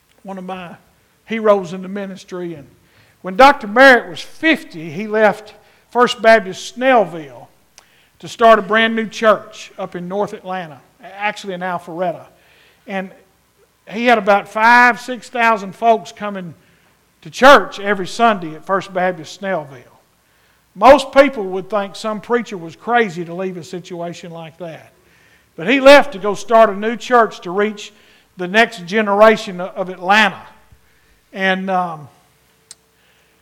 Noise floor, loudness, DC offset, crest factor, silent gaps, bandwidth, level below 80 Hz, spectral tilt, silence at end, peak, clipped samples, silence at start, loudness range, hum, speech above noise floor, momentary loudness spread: -56 dBFS; -14 LUFS; under 0.1%; 16 dB; none; 16.5 kHz; -50 dBFS; -4.5 dB/octave; 1.35 s; 0 dBFS; 0.1%; 0.25 s; 9 LU; none; 41 dB; 20 LU